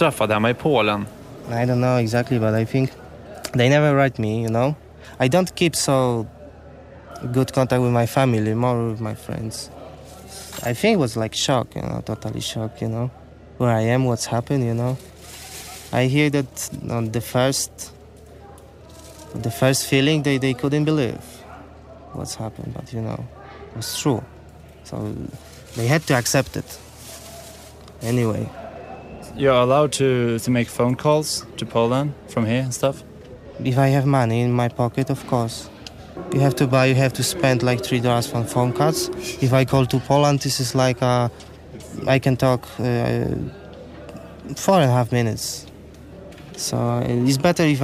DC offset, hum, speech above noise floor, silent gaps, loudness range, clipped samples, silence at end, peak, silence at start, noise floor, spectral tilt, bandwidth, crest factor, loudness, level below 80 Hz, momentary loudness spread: under 0.1%; none; 23 dB; none; 5 LU; under 0.1%; 0 s; -4 dBFS; 0 s; -43 dBFS; -5.5 dB/octave; 15.5 kHz; 18 dB; -21 LUFS; -48 dBFS; 20 LU